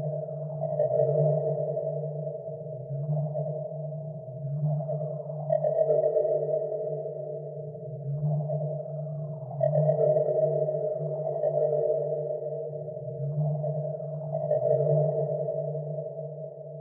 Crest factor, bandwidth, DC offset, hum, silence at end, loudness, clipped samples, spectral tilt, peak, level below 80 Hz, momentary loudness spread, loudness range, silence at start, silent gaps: 16 dB; 2.1 kHz; under 0.1%; none; 0 s; -29 LUFS; under 0.1%; -14 dB/octave; -12 dBFS; -72 dBFS; 12 LU; 5 LU; 0 s; none